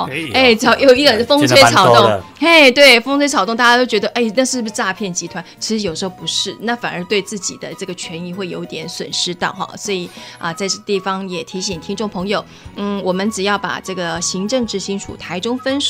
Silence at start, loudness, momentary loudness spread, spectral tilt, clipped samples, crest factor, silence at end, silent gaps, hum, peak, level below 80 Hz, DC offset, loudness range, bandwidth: 0 s; -14 LUFS; 17 LU; -3 dB/octave; under 0.1%; 16 dB; 0 s; none; none; 0 dBFS; -50 dBFS; under 0.1%; 12 LU; 16.5 kHz